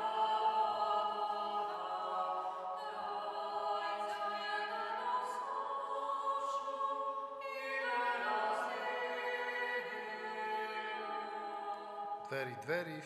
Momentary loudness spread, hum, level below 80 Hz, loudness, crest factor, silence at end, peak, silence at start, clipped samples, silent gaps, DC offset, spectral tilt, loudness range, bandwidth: 8 LU; none; -86 dBFS; -38 LUFS; 16 dB; 0 s; -24 dBFS; 0 s; under 0.1%; none; under 0.1%; -3.5 dB/octave; 3 LU; 13.5 kHz